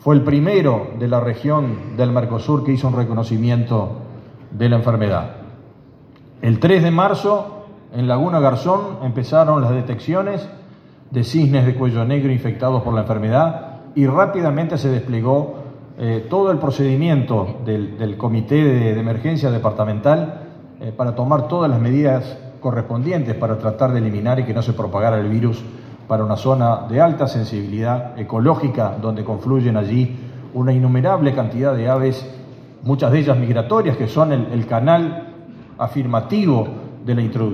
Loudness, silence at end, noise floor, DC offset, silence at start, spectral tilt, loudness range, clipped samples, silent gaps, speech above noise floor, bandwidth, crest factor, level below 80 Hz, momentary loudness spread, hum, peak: -18 LUFS; 0 s; -44 dBFS; under 0.1%; 0.05 s; -9 dB/octave; 2 LU; under 0.1%; none; 28 dB; 6.6 kHz; 16 dB; -54 dBFS; 11 LU; none; 0 dBFS